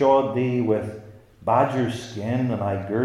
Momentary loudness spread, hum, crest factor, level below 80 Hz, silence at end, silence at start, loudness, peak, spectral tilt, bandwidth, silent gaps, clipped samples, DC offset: 11 LU; none; 16 dB; -60 dBFS; 0 s; 0 s; -23 LUFS; -6 dBFS; -7.5 dB/octave; 12 kHz; none; under 0.1%; under 0.1%